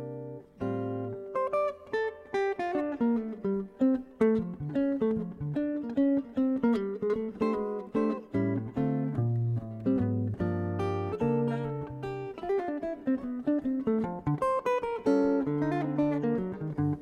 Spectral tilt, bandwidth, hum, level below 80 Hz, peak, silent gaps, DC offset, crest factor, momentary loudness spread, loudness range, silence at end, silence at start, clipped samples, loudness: -9 dB/octave; 9 kHz; none; -58 dBFS; -12 dBFS; none; under 0.1%; 16 dB; 7 LU; 3 LU; 0 s; 0 s; under 0.1%; -30 LUFS